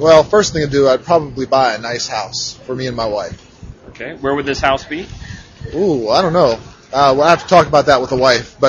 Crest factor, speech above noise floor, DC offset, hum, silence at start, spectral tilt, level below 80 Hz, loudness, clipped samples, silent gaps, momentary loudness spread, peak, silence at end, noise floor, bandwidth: 14 dB; 22 dB; under 0.1%; none; 0 s; -4.5 dB/octave; -40 dBFS; -14 LUFS; 0.2%; none; 16 LU; 0 dBFS; 0 s; -36 dBFS; 7.8 kHz